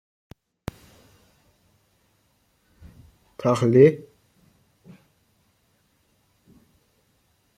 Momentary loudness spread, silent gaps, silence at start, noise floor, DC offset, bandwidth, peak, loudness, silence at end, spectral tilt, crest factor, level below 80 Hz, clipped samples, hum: 24 LU; none; 3.4 s; -66 dBFS; under 0.1%; 14.5 kHz; -4 dBFS; -19 LUFS; 3.6 s; -8 dB/octave; 24 dB; -58 dBFS; under 0.1%; none